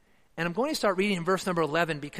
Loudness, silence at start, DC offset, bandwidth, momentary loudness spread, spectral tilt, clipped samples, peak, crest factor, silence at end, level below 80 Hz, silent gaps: -28 LUFS; 0.35 s; under 0.1%; 15 kHz; 6 LU; -5 dB/octave; under 0.1%; -10 dBFS; 18 dB; 0 s; -62 dBFS; none